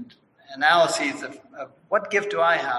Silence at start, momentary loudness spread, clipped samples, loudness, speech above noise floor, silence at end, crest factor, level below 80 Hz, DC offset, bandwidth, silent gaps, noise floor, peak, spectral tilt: 0 s; 21 LU; under 0.1%; -21 LUFS; 25 dB; 0 s; 18 dB; -74 dBFS; under 0.1%; 12 kHz; none; -48 dBFS; -6 dBFS; -2.5 dB/octave